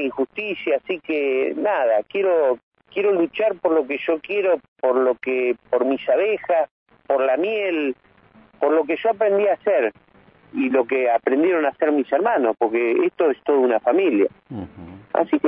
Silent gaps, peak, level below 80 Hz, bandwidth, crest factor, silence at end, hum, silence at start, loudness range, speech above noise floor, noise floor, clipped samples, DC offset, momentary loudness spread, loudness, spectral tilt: 2.63-2.71 s, 4.68-4.76 s, 6.71-6.86 s; -6 dBFS; -66 dBFS; 3.9 kHz; 16 dB; 0 s; none; 0 s; 3 LU; 32 dB; -52 dBFS; under 0.1%; under 0.1%; 7 LU; -21 LUFS; -9 dB/octave